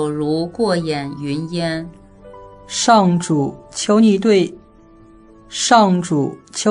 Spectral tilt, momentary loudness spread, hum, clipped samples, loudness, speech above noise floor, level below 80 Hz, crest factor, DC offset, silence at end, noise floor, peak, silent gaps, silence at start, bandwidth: -5 dB/octave; 12 LU; none; under 0.1%; -17 LUFS; 29 dB; -52 dBFS; 18 dB; under 0.1%; 0 s; -46 dBFS; 0 dBFS; none; 0 s; 10.5 kHz